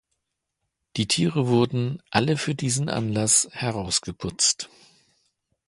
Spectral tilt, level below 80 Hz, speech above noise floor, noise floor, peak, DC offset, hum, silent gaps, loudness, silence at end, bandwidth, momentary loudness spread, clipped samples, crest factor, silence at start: -3.5 dB/octave; -54 dBFS; 56 dB; -80 dBFS; -2 dBFS; under 0.1%; none; none; -23 LUFS; 1 s; 11.5 kHz; 10 LU; under 0.1%; 24 dB; 0.95 s